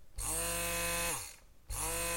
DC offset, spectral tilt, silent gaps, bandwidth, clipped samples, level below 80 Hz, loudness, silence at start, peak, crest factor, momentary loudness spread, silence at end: under 0.1%; -1.5 dB/octave; none; 17 kHz; under 0.1%; -48 dBFS; -35 LUFS; 0 s; -22 dBFS; 16 dB; 8 LU; 0 s